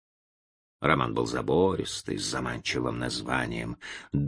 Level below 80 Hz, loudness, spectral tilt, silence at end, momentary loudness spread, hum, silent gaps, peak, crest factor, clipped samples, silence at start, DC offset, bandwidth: -50 dBFS; -29 LUFS; -5 dB/octave; 0 s; 8 LU; none; none; -4 dBFS; 24 dB; under 0.1%; 0.8 s; under 0.1%; 10.5 kHz